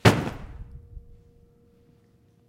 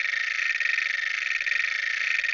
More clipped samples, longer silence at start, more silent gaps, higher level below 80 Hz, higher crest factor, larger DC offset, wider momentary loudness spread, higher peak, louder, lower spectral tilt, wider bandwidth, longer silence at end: neither; about the same, 0.05 s vs 0 s; neither; first, -44 dBFS vs -74 dBFS; first, 26 dB vs 14 dB; neither; first, 24 LU vs 2 LU; first, -2 dBFS vs -12 dBFS; about the same, -26 LUFS vs -24 LUFS; first, -5.5 dB/octave vs 3.5 dB/octave; first, 16 kHz vs 8 kHz; first, 1.5 s vs 0 s